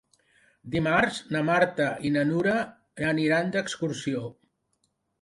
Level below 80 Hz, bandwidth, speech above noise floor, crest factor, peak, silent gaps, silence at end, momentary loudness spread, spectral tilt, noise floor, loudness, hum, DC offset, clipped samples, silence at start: -60 dBFS; 11.5 kHz; 49 dB; 20 dB; -6 dBFS; none; 0.9 s; 9 LU; -5.5 dB/octave; -74 dBFS; -26 LUFS; none; under 0.1%; under 0.1%; 0.65 s